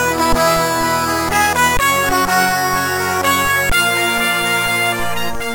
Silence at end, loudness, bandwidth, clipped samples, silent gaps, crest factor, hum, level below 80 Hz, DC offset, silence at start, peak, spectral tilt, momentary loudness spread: 0 s; -14 LUFS; 17 kHz; under 0.1%; none; 14 dB; none; -32 dBFS; under 0.1%; 0 s; -2 dBFS; -2.5 dB/octave; 3 LU